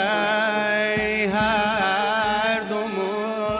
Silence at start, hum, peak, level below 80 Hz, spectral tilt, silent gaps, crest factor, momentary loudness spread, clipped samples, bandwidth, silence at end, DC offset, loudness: 0 s; none; -8 dBFS; -50 dBFS; -8 dB/octave; none; 14 dB; 5 LU; under 0.1%; 4 kHz; 0 s; under 0.1%; -22 LUFS